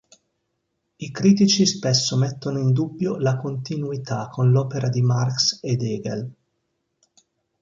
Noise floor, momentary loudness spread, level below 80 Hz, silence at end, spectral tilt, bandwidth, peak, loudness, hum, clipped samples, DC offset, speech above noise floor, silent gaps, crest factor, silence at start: -75 dBFS; 11 LU; -60 dBFS; 1.3 s; -5.5 dB/octave; 7.6 kHz; -4 dBFS; -21 LUFS; none; under 0.1%; under 0.1%; 54 dB; none; 18 dB; 1 s